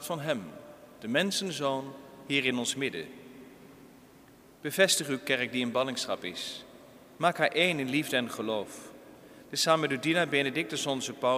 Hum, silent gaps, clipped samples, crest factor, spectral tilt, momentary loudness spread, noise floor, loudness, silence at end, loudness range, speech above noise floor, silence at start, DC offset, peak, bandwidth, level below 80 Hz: none; none; under 0.1%; 22 dB; -3 dB/octave; 18 LU; -56 dBFS; -29 LUFS; 0 s; 3 LU; 26 dB; 0 s; under 0.1%; -8 dBFS; 15.5 kHz; -72 dBFS